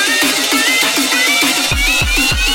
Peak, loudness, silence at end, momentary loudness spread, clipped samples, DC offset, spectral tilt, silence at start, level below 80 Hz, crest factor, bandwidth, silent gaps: -2 dBFS; -11 LUFS; 0 s; 1 LU; under 0.1%; under 0.1%; -1.5 dB/octave; 0 s; -26 dBFS; 12 dB; 17 kHz; none